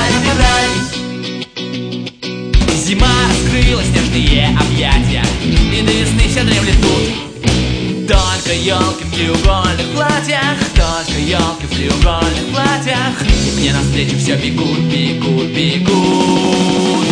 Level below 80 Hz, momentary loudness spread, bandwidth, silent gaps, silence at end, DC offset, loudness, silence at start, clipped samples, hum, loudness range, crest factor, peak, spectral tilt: -20 dBFS; 6 LU; 10.5 kHz; none; 0 s; under 0.1%; -13 LUFS; 0 s; under 0.1%; none; 2 LU; 12 dB; 0 dBFS; -4.5 dB/octave